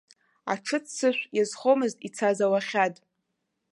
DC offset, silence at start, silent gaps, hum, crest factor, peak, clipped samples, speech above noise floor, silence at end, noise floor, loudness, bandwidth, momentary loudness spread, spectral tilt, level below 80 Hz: under 0.1%; 0.45 s; none; none; 18 dB; -8 dBFS; under 0.1%; 54 dB; 0.8 s; -80 dBFS; -26 LUFS; 11.5 kHz; 7 LU; -4 dB/octave; -82 dBFS